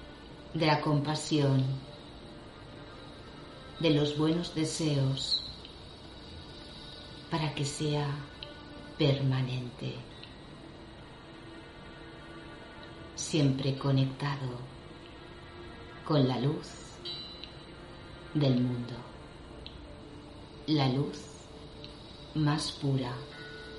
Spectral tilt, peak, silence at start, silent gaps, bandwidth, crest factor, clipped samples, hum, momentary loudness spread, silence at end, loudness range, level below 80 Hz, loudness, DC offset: -6 dB/octave; -14 dBFS; 0 s; none; 11.5 kHz; 20 dB; under 0.1%; none; 20 LU; 0 s; 5 LU; -56 dBFS; -31 LUFS; under 0.1%